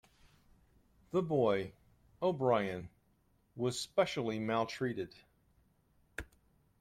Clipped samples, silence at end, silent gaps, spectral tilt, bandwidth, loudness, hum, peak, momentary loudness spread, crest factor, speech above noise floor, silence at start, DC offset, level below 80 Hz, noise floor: under 0.1%; 0.55 s; none; -5.5 dB/octave; 15 kHz; -35 LUFS; none; -16 dBFS; 17 LU; 20 dB; 38 dB; 1.15 s; under 0.1%; -66 dBFS; -72 dBFS